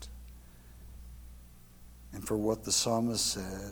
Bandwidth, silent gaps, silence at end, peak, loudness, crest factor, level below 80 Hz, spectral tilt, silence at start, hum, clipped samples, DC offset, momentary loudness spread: 19 kHz; none; 0 s; -16 dBFS; -31 LUFS; 20 dB; -52 dBFS; -3.5 dB/octave; 0 s; 60 Hz at -55 dBFS; under 0.1%; under 0.1%; 24 LU